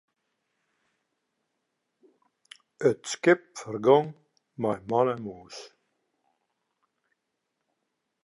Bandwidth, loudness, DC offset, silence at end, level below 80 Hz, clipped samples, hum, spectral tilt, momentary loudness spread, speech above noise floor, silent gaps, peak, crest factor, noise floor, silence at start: 11.5 kHz; -26 LUFS; under 0.1%; 2.55 s; -74 dBFS; under 0.1%; none; -5.5 dB/octave; 19 LU; 56 dB; none; -6 dBFS; 24 dB; -81 dBFS; 2.8 s